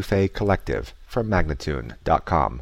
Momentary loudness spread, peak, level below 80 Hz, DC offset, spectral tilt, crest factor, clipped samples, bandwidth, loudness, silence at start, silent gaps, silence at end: 8 LU; -6 dBFS; -34 dBFS; under 0.1%; -7 dB/octave; 16 dB; under 0.1%; 15.5 kHz; -24 LUFS; 0 s; none; 0 s